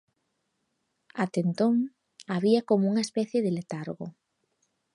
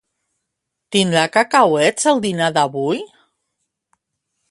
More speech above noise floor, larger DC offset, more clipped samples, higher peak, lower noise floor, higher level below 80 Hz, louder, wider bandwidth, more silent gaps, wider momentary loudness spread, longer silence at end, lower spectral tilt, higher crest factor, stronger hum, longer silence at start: second, 51 dB vs 62 dB; neither; neither; second, -10 dBFS vs 0 dBFS; about the same, -78 dBFS vs -78 dBFS; second, -78 dBFS vs -64 dBFS; second, -27 LUFS vs -16 LUFS; about the same, 11.5 kHz vs 11.5 kHz; neither; first, 14 LU vs 8 LU; second, 0.85 s vs 1.45 s; first, -6.5 dB/octave vs -4 dB/octave; about the same, 18 dB vs 18 dB; neither; first, 1.15 s vs 0.9 s